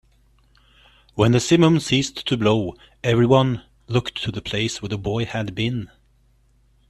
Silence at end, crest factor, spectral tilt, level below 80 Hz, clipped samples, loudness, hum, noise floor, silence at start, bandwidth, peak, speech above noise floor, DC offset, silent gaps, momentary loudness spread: 1.05 s; 20 dB; -5.5 dB/octave; -48 dBFS; under 0.1%; -21 LUFS; none; -59 dBFS; 1.15 s; 12.5 kHz; -2 dBFS; 39 dB; under 0.1%; none; 11 LU